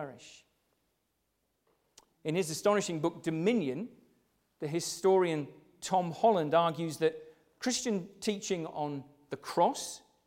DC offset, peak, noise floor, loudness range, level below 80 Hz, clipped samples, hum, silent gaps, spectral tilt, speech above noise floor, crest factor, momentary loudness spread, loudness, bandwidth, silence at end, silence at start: under 0.1%; -14 dBFS; -79 dBFS; 4 LU; -74 dBFS; under 0.1%; none; none; -4.5 dB/octave; 48 dB; 18 dB; 16 LU; -32 LUFS; 16.5 kHz; 0.3 s; 0 s